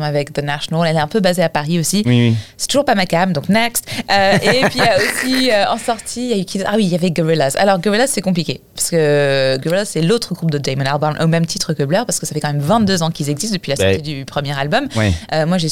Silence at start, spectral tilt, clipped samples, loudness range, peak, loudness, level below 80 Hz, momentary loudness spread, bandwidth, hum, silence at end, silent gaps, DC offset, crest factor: 0 s; -4.5 dB/octave; under 0.1%; 3 LU; -2 dBFS; -16 LUFS; -46 dBFS; 6 LU; 18.5 kHz; none; 0 s; none; 1%; 14 dB